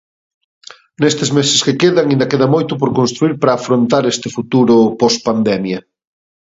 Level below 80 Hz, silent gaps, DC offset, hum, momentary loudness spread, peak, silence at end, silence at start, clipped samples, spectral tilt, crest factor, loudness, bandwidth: -56 dBFS; none; under 0.1%; none; 6 LU; 0 dBFS; 0.65 s; 1 s; under 0.1%; -5 dB/octave; 14 dB; -13 LUFS; 8 kHz